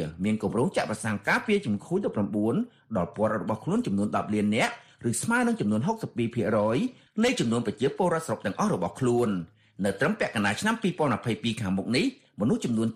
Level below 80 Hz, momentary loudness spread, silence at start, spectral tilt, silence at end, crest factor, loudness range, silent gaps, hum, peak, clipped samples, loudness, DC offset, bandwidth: -60 dBFS; 6 LU; 0 s; -5.5 dB/octave; 0 s; 16 dB; 1 LU; none; none; -12 dBFS; under 0.1%; -27 LUFS; under 0.1%; 15 kHz